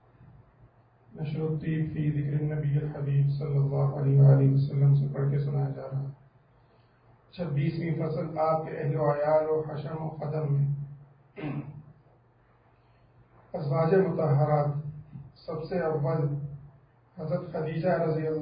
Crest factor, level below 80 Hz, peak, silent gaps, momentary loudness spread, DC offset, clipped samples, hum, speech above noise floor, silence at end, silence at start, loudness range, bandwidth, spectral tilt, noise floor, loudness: 18 dB; -58 dBFS; -10 dBFS; none; 15 LU; under 0.1%; under 0.1%; none; 36 dB; 0 s; 1.15 s; 8 LU; 5 kHz; -13 dB/octave; -62 dBFS; -28 LUFS